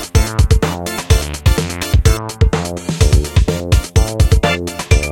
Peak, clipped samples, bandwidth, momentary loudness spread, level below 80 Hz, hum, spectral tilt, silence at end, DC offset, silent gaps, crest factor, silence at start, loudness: 0 dBFS; under 0.1%; 17 kHz; 5 LU; -18 dBFS; none; -5 dB/octave; 0 s; 0.4%; none; 14 dB; 0 s; -15 LUFS